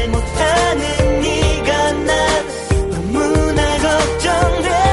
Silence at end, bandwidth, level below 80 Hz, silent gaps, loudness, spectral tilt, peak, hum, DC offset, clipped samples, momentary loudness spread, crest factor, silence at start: 0 s; 11.5 kHz; -22 dBFS; none; -16 LUFS; -4.5 dB/octave; -4 dBFS; none; under 0.1%; under 0.1%; 4 LU; 12 dB; 0 s